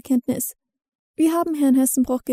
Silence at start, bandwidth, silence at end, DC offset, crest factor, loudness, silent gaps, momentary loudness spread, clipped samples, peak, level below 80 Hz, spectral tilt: 0.05 s; 16 kHz; 0 s; under 0.1%; 12 dB; -20 LUFS; 0.95-1.14 s; 10 LU; under 0.1%; -8 dBFS; -56 dBFS; -4.5 dB/octave